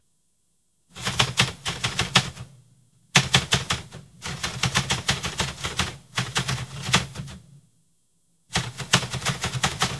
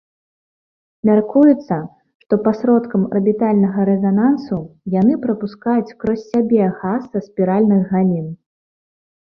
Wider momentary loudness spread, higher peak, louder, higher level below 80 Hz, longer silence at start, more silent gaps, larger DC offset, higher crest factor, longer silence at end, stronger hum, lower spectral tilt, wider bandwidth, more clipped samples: first, 13 LU vs 9 LU; about the same, 0 dBFS vs -2 dBFS; second, -24 LUFS vs -17 LUFS; first, -46 dBFS vs -56 dBFS; about the same, 0.95 s vs 1.05 s; second, none vs 2.15-2.20 s; neither; first, 28 dB vs 14 dB; second, 0 s vs 1.05 s; neither; second, -2.5 dB/octave vs -10.5 dB/octave; first, 12 kHz vs 6 kHz; neither